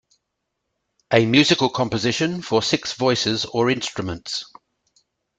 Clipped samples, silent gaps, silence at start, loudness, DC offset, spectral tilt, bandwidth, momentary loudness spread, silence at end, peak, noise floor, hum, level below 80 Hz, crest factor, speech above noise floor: under 0.1%; none; 1.1 s; -20 LUFS; under 0.1%; -4.5 dB/octave; 9.4 kHz; 12 LU; 0.95 s; -2 dBFS; -78 dBFS; none; -56 dBFS; 20 dB; 58 dB